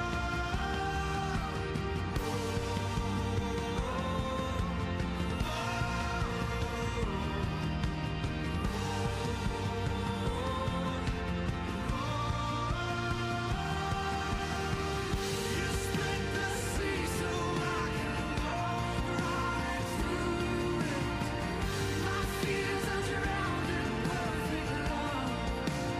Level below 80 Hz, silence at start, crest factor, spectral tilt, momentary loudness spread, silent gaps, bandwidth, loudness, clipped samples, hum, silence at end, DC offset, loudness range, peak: -42 dBFS; 0 s; 12 dB; -5 dB/octave; 2 LU; none; 15.5 kHz; -34 LUFS; under 0.1%; none; 0 s; under 0.1%; 1 LU; -20 dBFS